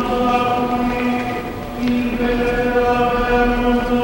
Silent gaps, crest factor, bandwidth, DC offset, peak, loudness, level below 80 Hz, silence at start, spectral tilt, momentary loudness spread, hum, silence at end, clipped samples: none; 14 dB; 16 kHz; under 0.1%; -4 dBFS; -18 LUFS; -30 dBFS; 0 s; -6 dB/octave; 6 LU; none; 0 s; under 0.1%